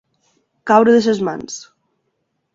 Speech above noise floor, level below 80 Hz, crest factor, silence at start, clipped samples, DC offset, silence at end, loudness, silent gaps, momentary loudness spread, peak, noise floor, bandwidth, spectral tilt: 56 dB; -60 dBFS; 18 dB; 0.65 s; under 0.1%; under 0.1%; 0.9 s; -14 LUFS; none; 20 LU; 0 dBFS; -70 dBFS; 7.8 kHz; -5 dB/octave